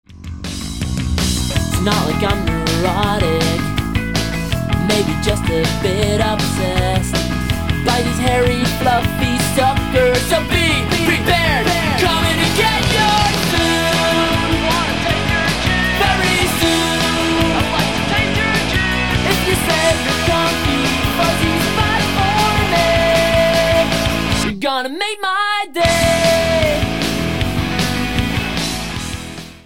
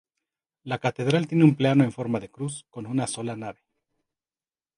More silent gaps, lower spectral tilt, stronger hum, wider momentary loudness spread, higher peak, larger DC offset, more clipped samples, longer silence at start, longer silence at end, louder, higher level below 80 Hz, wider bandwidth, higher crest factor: neither; second, -4.5 dB/octave vs -6.5 dB/octave; neither; second, 6 LU vs 17 LU; about the same, -2 dBFS vs -4 dBFS; first, 1% vs under 0.1%; neither; second, 0.05 s vs 0.65 s; second, 0 s vs 1.25 s; first, -16 LUFS vs -25 LUFS; first, -28 dBFS vs -66 dBFS; first, 17.5 kHz vs 11 kHz; second, 14 dB vs 22 dB